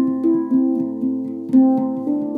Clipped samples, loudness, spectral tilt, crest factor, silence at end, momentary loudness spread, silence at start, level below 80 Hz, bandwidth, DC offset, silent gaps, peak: under 0.1%; -19 LUFS; -10.5 dB/octave; 14 dB; 0 s; 8 LU; 0 s; -74 dBFS; 2 kHz; under 0.1%; none; -4 dBFS